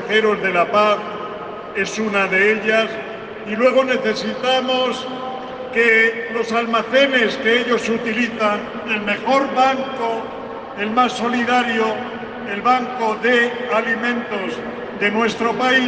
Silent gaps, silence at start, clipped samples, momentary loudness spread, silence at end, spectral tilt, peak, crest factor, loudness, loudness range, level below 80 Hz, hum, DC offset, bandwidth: none; 0 s; under 0.1%; 13 LU; 0 s; -4 dB/octave; -4 dBFS; 16 dB; -18 LUFS; 3 LU; -58 dBFS; none; under 0.1%; 9.4 kHz